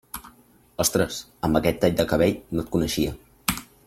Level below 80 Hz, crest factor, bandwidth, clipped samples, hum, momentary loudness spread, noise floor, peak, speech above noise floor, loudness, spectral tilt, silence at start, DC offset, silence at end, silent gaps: -44 dBFS; 20 dB; 16.5 kHz; under 0.1%; none; 8 LU; -55 dBFS; -4 dBFS; 32 dB; -24 LUFS; -4.5 dB/octave; 0.15 s; under 0.1%; 0.2 s; none